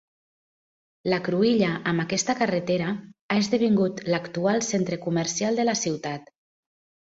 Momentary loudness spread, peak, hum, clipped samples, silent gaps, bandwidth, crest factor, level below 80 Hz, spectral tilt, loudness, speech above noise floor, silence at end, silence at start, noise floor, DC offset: 8 LU; -8 dBFS; none; under 0.1%; 3.21-3.29 s; 8 kHz; 18 dB; -64 dBFS; -4.5 dB/octave; -25 LUFS; over 66 dB; 0.9 s; 1.05 s; under -90 dBFS; under 0.1%